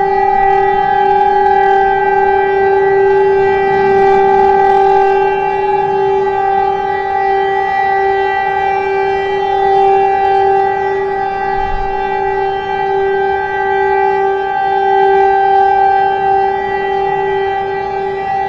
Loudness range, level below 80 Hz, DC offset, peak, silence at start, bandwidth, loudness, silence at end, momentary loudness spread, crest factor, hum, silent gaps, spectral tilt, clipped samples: 4 LU; -36 dBFS; under 0.1%; 0 dBFS; 0 s; 6.6 kHz; -12 LUFS; 0 s; 6 LU; 10 dB; none; none; -6.5 dB/octave; under 0.1%